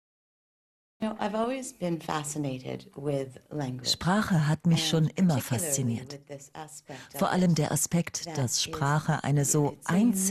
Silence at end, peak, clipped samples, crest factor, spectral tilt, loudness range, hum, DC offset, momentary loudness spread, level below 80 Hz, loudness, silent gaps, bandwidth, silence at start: 0 s; -12 dBFS; under 0.1%; 16 dB; -4.5 dB/octave; 6 LU; none; under 0.1%; 14 LU; -60 dBFS; -28 LUFS; none; 13 kHz; 1 s